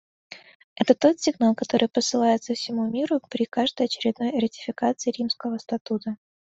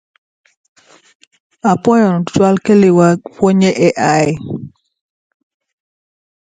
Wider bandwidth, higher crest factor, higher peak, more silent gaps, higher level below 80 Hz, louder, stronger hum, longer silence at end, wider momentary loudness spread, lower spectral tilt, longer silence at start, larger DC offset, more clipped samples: second, 8 kHz vs 9.4 kHz; first, 22 dB vs 14 dB; second, -4 dBFS vs 0 dBFS; first, 0.55-0.76 s, 5.81-5.85 s vs none; second, -68 dBFS vs -52 dBFS; second, -24 LUFS vs -12 LUFS; neither; second, 0.35 s vs 1.9 s; about the same, 9 LU vs 9 LU; second, -4 dB/octave vs -6.5 dB/octave; second, 0.3 s vs 1.65 s; neither; neither